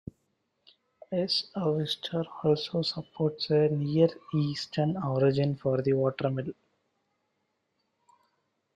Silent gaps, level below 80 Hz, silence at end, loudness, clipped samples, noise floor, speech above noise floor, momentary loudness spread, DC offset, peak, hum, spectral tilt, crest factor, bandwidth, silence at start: none; -68 dBFS; 2.25 s; -29 LUFS; under 0.1%; -78 dBFS; 50 dB; 7 LU; under 0.1%; -10 dBFS; none; -7 dB/octave; 20 dB; 10.5 kHz; 1.1 s